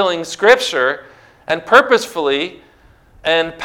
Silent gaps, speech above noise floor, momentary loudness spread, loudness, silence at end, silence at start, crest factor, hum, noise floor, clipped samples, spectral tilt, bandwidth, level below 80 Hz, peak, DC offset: none; 33 dB; 14 LU; -15 LUFS; 0 s; 0 s; 16 dB; none; -48 dBFS; 0.3%; -2.5 dB/octave; 17 kHz; -54 dBFS; 0 dBFS; under 0.1%